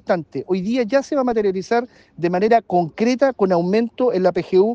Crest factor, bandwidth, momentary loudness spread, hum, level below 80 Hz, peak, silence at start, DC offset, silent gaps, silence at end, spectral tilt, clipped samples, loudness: 14 dB; 7.8 kHz; 6 LU; none; -58 dBFS; -4 dBFS; 0.05 s; under 0.1%; none; 0 s; -7 dB/octave; under 0.1%; -19 LUFS